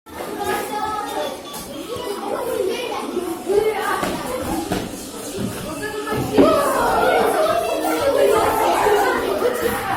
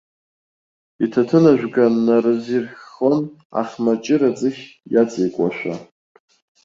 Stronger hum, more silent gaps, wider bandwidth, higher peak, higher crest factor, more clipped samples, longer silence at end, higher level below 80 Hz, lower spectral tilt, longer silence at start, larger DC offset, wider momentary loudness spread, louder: neither; second, none vs 3.45-3.50 s; first, 20 kHz vs 7.6 kHz; about the same, -2 dBFS vs -2 dBFS; about the same, 18 dB vs 16 dB; neither; second, 0 s vs 0.8 s; first, -46 dBFS vs -62 dBFS; second, -4 dB/octave vs -7.5 dB/octave; second, 0.05 s vs 1 s; neither; about the same, 11 LU vs 12 LU; about the same, -20 LUFS vs -18 LUFS